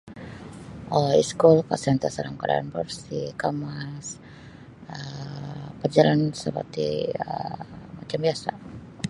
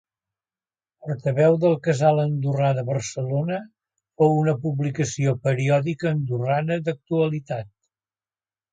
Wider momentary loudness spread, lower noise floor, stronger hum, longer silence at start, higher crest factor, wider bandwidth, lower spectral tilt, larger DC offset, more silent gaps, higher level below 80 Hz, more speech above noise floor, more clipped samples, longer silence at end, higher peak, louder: first, 22 LU vs 9 LU; second, -45 dBFS vs under -90 dBFS; neither; second, 0.05 s vs 1.05 s; first, 24 dB vs 18 dB; first, 11.5 kHz vs 9 kHz; about the same, -6 dB/octave vs -7 dB/octave; neither; neither; first, -56 dBFS vs -62 dBFS; second, 21 dB vs over 68 dB; neither; second, 0 s vs 1.05 s; first, -2 dBFS vs -6 dBFS; about the same, -25 LUFS vs -23 LUFS